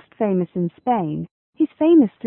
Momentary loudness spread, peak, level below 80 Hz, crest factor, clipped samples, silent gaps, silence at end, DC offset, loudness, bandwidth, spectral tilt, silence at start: 13 LU; -6 dBFS; -62 dBFS; 14 dB; under 0.1%; 1.31-1.53 s; 0 s; under 0.1%; -20 LUFS; 3.5 kHz; -13 dB/octave; 0.2 s